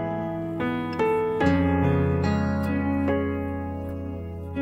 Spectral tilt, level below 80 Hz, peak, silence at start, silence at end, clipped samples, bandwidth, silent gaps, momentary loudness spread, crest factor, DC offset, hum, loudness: -8.5 dB/octave; -42 dBFS; -8 dBFS; 0 s; 0 s; under 0.1%; 12.5 kHz; none; 11 LU; 16 dB; under 0.1%; none; -25 LUFS